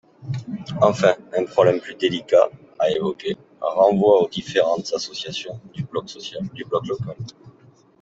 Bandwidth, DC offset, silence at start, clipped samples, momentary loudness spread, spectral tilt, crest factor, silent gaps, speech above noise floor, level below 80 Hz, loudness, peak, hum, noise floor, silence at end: 8 kHz; under 0.1%; 0.2 s; under 0.1%; 15 LU; -5.5 dB/octave; 20 dB; none; 32 dB; -60 dBFS; -21 LUFS; 0 dBFS; none; -53 dBFS; 0.5 s